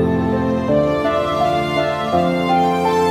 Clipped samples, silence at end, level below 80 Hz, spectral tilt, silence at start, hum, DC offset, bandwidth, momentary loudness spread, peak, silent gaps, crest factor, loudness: under 0.1%; 0 s; -42 dBFS; -6.5 dB/octave; 0 s; none; under 0.1%; 15.5 kHz; 2 LU; -4 dBFS; none; 12 dB; -17 LUFS